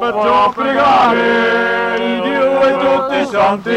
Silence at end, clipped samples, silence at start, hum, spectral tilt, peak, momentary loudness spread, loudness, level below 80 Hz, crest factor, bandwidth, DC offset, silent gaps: 0 s; under 0.1%; 0 s; none; -5 dB/octave; -4 dBFS; 5 LU; -13 LUFS; -50 dBFS; 10 dB; 11 kHz; under 0.1%; none